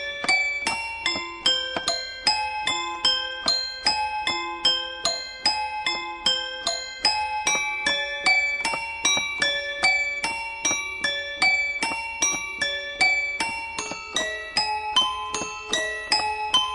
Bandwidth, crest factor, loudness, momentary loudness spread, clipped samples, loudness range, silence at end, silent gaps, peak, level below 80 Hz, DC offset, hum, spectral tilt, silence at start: 11.5 kHz; 20 dB; -23 LUFS; 6 LU; under 0.1%; 2 LU; 0 s; none; -6 dBFS; -54 dBFS; under 0.1%; none; 0.5 dB/octave; 0 s